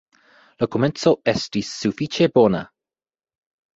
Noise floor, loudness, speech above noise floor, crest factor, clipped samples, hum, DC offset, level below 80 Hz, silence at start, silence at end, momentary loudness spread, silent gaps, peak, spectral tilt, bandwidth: under -90 dBFS; -20 LUFS; over 71 dB; 20 dB; under 0.1%; none; under 0.1%; -56 dBFS; 0.6 s; 1.1 s; 10 LU; none; -2 dBFS; -5.5 dB/octave; 8 kHz